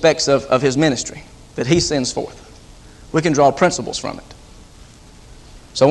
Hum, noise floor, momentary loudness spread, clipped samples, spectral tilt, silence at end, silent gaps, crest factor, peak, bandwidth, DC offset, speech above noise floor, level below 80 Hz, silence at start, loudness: none; -42 dBFS; 16 LU; under 0.1%; -4.5 dB/octave; 0 s; none; 18 dB; 0 dBFS; 12 kHz; under 0.1%; 26 dB; -44 dBFS; 0 s; -18 LUFS